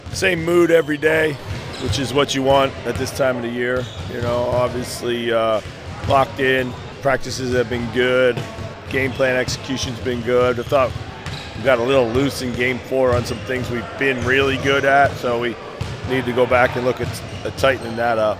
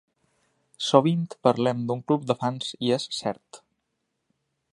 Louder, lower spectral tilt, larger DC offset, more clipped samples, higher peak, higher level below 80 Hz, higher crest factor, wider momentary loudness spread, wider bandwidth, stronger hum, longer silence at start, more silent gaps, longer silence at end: first, -19 LUFS vs -25 LUFS; about the same, -5 dB/octave vs -6 dB/octave; neither; neither; about the same, -2 dBFS vs -2 dBFS; first, -40 dBFS vs -70 dBFS; second, 18 dB vs 26 dB; about the same, 11 LU vs 10 LU; first, 16 kHz vs 11.5 kHz; neither; second, 0 s vs 0.8 s; neither; second, 0 s vs 1.15 s